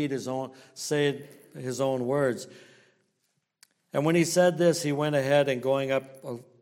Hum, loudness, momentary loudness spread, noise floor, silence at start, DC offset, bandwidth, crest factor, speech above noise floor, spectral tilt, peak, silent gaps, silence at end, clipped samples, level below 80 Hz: none; -26 LUFS; 17 LU; -77 dBFS; 0 s; under 0.1%; 16.5 kHz; 18 dB; 50 dB; -5 dB/octave; -10 dBFS; none; 0.2 s; under 0.1%; -72 dBFS